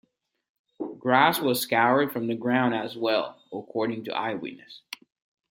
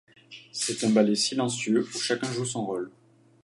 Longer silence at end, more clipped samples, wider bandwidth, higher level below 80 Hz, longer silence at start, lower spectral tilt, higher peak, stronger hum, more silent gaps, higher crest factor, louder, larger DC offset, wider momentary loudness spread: first, 0.75 s vs 0.55 s; neither; first, 16.5 kHz vs 11.5 kHz; about the same, -74 dBFS vs -74 dBFS; first, 0.8 s vs 0.3 s; about the same, -4.5 dB/octave vs -4 dB/octave; first, -4 dBFS vs -8 dBFS; neither; neither; about the same, 22 dB vs 20 dB; about the same, -25 LUFS vs -26 LUFS; neither; first, 20 LU vs 13 LU